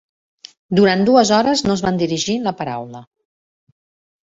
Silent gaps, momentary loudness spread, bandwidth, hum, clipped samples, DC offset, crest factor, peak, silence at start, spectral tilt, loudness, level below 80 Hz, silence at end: none; 13 LU; 8 kHz; none; under 0.1%; under 0.1%; 18 dB; -2 dBFS; 0.7 s; -5 dB/octave; -16 LUFS; -52 dBFS; 1.2 s